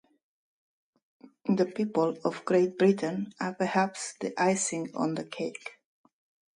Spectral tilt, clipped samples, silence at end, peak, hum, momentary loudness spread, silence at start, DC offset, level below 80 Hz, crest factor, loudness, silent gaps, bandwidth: -5 dB/octave; under 0.1%; 0.85 s; -12 dBFS; none; 11 LU; 1.45 s; under 0.1%; -76 dBFS; 18 dB; -29 LUFS; none; 11.5 kHz